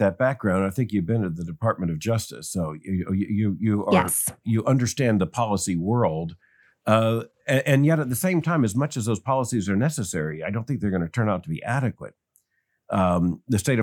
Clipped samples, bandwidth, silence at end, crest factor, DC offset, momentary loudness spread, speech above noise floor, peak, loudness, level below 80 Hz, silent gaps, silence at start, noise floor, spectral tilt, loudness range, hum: under 0.1%; 19 kHz; 0 s; 20 dB; under 0.1%; 8 LU; 50 dB; -4 dBFS; -24 LUFS; -58 dBFS; none; 0 s; -73 dBFS; -6 dB/octave; 4 LU; none